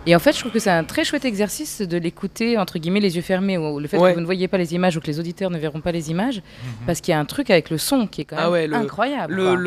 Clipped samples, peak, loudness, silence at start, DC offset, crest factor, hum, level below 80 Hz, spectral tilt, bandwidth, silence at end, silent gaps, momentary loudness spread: under 0.1%; 0 dBFS; -21 LUFS; 0 s; under 0.1%; 20 dB; none; -50 dBFS; -5 dB/octave; 15 kHz; 0 s; none; 8 LU